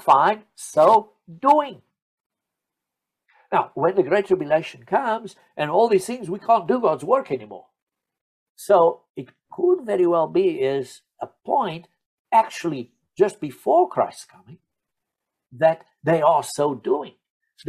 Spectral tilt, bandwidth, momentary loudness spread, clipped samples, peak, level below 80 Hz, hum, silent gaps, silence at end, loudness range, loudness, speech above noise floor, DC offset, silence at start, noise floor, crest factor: -5.5 dB/octave; 14 kHz; 18 LU; under 0.1%; -4 dBFS; -70 dBFS; none; 2.02-2.30 s, 7.82-7.87 s, 8.21-8.55 s, 9.10-9.14 s, 12.06-12.25 s, 17.30-17.40 s; 0 s; 2 LU; -21 LUFS; 64 dB; under 0.1%; 0.05 s; -85 dBFS; 18 dB